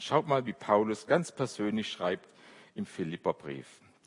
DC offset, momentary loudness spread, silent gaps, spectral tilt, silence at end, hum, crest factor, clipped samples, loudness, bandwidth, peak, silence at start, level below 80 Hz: under 0.1%; 14 LU; none; -5.5 dB/octave; 0.35 s; none; 22 dB; under 0.1%; -32 LUFS; 11 kHz; -10 dBFS; 0 s; -76 dBFS